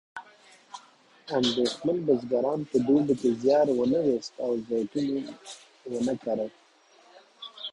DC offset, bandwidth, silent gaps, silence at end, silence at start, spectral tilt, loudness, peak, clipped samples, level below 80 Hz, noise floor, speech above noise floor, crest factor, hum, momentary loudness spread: under 0.1%; 11 kHz; none; 0 s; 0.15 s; -5.5 dB/octave; -27 LUFS; -10 dBFS; under 0.1%; -66 dBFS; -59 dBFS; 33 dB; 18 dB; none; 21 LU